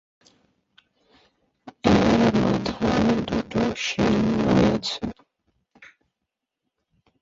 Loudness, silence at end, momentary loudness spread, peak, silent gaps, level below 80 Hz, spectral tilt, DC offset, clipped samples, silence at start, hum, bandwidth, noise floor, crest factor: -22 LUFS; 1.35 s; 8 LU; -4 dBFS; none; -44 dBFS; -6 dB/octave; under 0.1%; under 0.1%; 1.65 s; none; 7.8 kHz; -83 dBFS; 20 dB